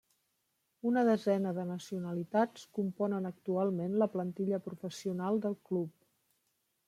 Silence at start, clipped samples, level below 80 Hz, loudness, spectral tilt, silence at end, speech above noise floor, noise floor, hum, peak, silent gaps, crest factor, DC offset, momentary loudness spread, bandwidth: 0.85 s; under 0.1%; -82 dBFS; -34 LUFS; -7.5 dB/octave; 1 s; 47 dB; -80 dBFS; none; -16 dBFS; none; 18 dB; under 0.1%; 9 LU; 14 kHz